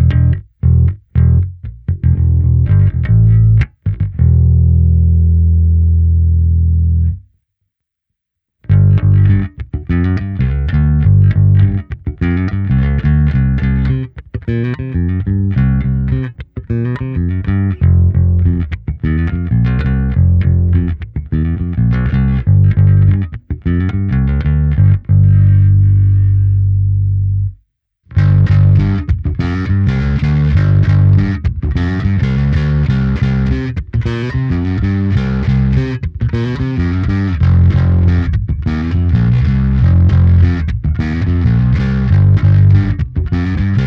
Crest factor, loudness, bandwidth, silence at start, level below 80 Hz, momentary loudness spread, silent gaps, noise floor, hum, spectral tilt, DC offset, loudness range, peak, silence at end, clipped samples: 12 dB; -13 LUFS; 5.2 kHz; 0 s; -20 dBFS; 8 LU; none; -76 dBFS; none; -10 dB/octave; under 0.1%; 4 LU; 0 dBFS; 0 s; under 0.1%